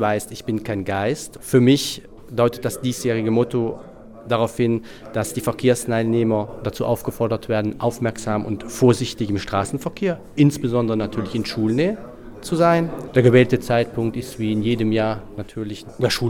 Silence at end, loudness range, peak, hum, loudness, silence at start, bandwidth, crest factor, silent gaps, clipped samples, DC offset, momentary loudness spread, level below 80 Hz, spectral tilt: 0 s; 3 LU; -2 dBFS; none; -21 LUFS; 0 s; 19 kHz; 18 dB; none; under 0.1%; under 0.1%; 11 LU; -46 dBFS; -6 dB/octave